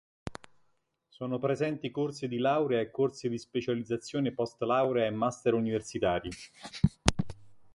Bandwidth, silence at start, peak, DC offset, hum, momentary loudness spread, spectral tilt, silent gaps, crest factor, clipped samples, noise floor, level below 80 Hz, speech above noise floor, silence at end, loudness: 11.5 kHz; 0.25 s; -2 dBFS; under 0.1%; none; 14 LU; -5.5 dB/octave; none; 30 dB; under 0.1%; -74 dBFS; -50 dBFS; 43 dB; 0.05 s; -31 LUFS